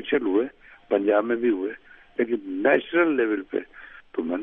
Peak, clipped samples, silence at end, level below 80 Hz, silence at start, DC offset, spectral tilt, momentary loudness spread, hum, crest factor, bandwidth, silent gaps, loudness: -6 dBFS; under 0.1%; 0 s; -64 dBFS; 0 s; under 0.1%; -8 dB/octave; 13 LU; none; 20 dB; 3.8 kHz; none; -24 LUFS